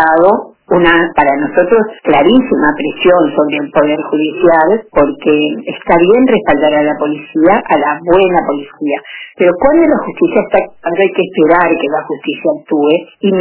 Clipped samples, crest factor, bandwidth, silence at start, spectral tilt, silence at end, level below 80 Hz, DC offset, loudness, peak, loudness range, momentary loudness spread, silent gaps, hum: 0.2%; 10 dB; 4 kHz; 0 s; -9.5 dB/octave; 0 s; -42 dBFS; under 0.1%; -11 LUFS; 0 dBFS; 2 LU; 8 LU; none; none